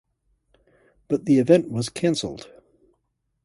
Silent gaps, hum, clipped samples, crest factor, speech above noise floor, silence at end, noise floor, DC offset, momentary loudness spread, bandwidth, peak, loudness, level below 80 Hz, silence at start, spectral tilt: none; none; under 0.1%; 22 dB; 53 dB; 1 s; -74 dBFS; under 0.1%; 14 LU; 11.5 kHz; -4 dBFS; -22 LUFS; -60 dBFS; 1.1 s; -6 dB/octave